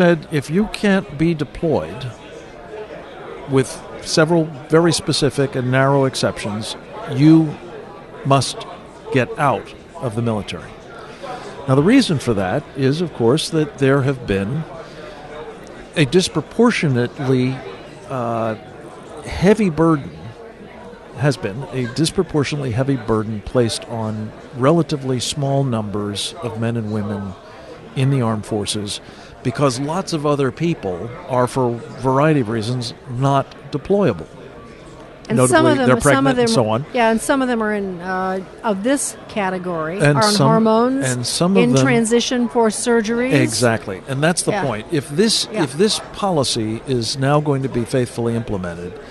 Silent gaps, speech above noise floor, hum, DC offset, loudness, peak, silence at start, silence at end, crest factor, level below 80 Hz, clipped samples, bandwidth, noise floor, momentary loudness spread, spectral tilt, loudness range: none; 21 dB; none; under 0.1%; -18 LUFS; 0 dBFS; 0 s; 0 s; 18 dB; -46 dBFS; under 0.1%; 12 kHz; -38 dBFS; 19 LU; -5.5 dB/octave; 6 LU